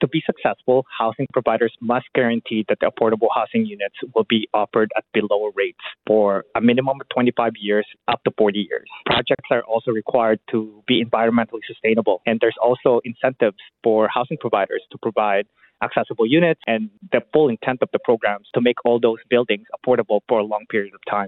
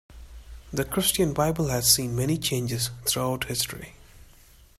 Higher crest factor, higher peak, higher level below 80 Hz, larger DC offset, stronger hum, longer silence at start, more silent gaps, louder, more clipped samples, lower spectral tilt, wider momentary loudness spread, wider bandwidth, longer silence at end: second, 16 dB vs 24 dB; about the same, -2 dBFS vs -4 dBFS; second, -62 dBFS vs -46 dBFS; neither; neither; about the same, 0 s vs 0.1 s; neither; first, -20 LUFS vs -25 LUFS; neither; first, -10 dB/octave vs -3.5 dB/octave; second, 6 LU vs 11 LU; second, 4.3 kHz vs 16 kHz; second, 0 s vs 0.55 s